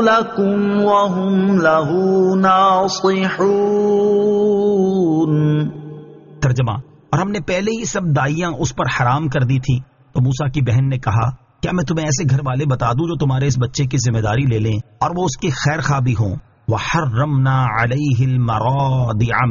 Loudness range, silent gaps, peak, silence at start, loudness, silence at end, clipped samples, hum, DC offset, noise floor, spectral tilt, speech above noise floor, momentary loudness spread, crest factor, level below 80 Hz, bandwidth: 4 LU; none; -2 dBFS; 0 s; -17 LUFS; 0 s; under 0.1%; none; under 0.1%; -37 dBFS; -6.5 dB/octave; 21 dB; 7 LU; 14 dB; -42 dBFS; 7.4 kHz